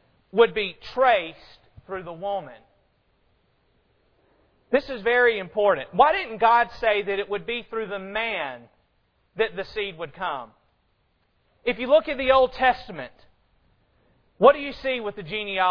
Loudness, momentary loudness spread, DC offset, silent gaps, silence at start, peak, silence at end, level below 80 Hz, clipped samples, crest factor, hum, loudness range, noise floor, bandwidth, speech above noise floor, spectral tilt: -23 LUFS; 14 LU; under 0.1%; none; 0.35 s; -2 dBFS; 0 s; -54 dBFS; under 0.1%; 22 dB; none; 10 LU; -68 dBFS; 5.4 kHz; 45 dB; -6 dB/octave